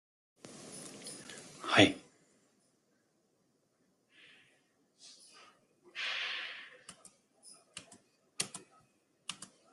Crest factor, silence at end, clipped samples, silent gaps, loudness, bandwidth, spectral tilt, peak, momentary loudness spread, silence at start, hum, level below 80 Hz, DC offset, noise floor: 32 dB; 0.3 s; under 0.1%; none; -34 LUFS; 12.5 kHz; -3 dB/octave; -8 dBFS; 29 LU; 0.45 s; none; -78 dBFS; under 0.1%; -76 dBFS